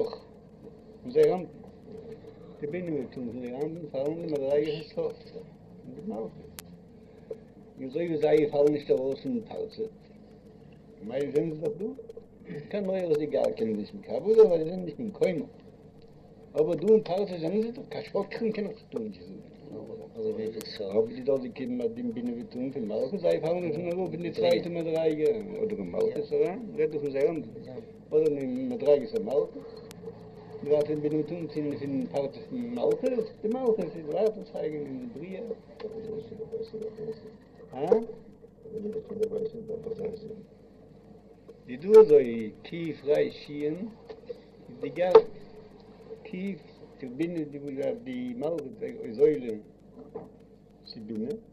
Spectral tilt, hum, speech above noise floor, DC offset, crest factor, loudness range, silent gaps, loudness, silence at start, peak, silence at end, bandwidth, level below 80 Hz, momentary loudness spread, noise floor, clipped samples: -7.5 dB/octave; none; 24 dB; under 0.1%; 26 dB; 10 LU; none; -29 LUFS; 0 s; -4 dBFS; 0.1 s; 12.5 kHz; -64 dBFS; 20 LU; -53 dBFS; under 0.1%